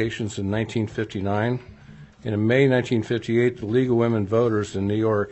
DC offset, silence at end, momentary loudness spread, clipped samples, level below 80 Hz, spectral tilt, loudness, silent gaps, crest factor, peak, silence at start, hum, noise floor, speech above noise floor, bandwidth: under 0.1%; 0 s; 8 LU; under 0.1%; -54 dBFS; -7 dB/octave; -23 LUFS; none; 18 dB; -6 dBFS; 0 s; none; -45 dBFS; 23 dB; 8.4 kHz